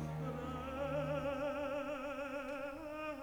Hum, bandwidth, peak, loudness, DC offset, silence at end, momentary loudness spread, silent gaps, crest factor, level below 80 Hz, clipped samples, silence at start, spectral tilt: none; over 20 kHz; -28 dBFS; -41 LUFS; under 0.1%; 0 s; 6 LU; none; 14 dB; -58 dBFS; under 0.1%; 0 s; -6.5 dB/octave